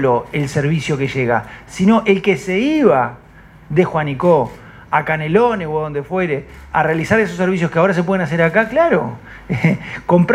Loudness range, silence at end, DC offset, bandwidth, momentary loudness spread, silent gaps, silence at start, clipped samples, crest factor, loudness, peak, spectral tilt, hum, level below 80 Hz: 2 LU; 0 s; under 0.1%; 12.5 kHz; 8 LU; none; 0 s; under 0.1%; 16 dB; -16 LUFS; 0 dBFS; -7 dB/octave; none; -44 dBFS